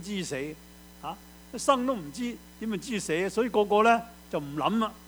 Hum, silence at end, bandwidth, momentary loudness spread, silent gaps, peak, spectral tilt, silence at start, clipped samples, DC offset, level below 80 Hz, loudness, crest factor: none; 0 s; over 20 kHz; 18 LU; none; -8 dBFS; -4.5 dB/octave; 0 s; under 0.1%; under 0.1%; -56 dBFS; -28 LUFS; 20 dB